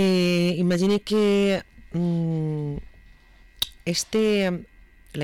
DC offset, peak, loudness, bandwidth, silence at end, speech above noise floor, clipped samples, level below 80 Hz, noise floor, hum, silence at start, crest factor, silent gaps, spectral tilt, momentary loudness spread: under 0.1%; -12 dBFS; -24 LUFS; 19 kHz; 0 s; 29 dB; under 0.1%; -50 dBFS; -51 dBFS; none; 0 s; 10 dB; none; -5.5 dB/octave; 12 LU